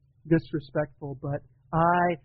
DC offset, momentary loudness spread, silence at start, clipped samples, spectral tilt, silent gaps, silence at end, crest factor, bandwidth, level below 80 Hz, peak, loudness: under 0.1%; 12 LU; 0.25 s; under 0.1%; -7 dB/octave; none; 0.1 s; 18 dB; 4.9 kHz; -52 dBFS; -10 dBFS; -28 LUFS